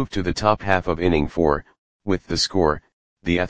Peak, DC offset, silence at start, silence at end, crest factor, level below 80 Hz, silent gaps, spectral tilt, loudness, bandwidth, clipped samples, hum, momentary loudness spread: 0 dBFS; 1%; 0 s; 0 s; 22 dB; -38 dBFS; 1.78-2.00 s, 2.93-3.17 s; -5 dB/octave; -22 LUFS; 9.8 kHz; under 0.1%; none; 8 LU